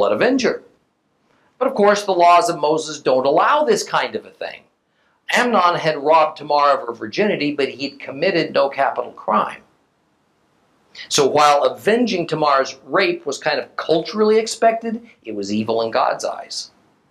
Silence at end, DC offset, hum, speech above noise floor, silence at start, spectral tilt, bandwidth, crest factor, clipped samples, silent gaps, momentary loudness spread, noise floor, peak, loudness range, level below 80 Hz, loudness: 0.45 s; under 0.1%; none; 47 dB; 0 s; -3.5 dB/octave; 14 kHz; 18 dB; under 0.1%; none; 13 LU; -64 dBFS; -2 dBFS; 4 LU; -68 dBFS; -18 LUFS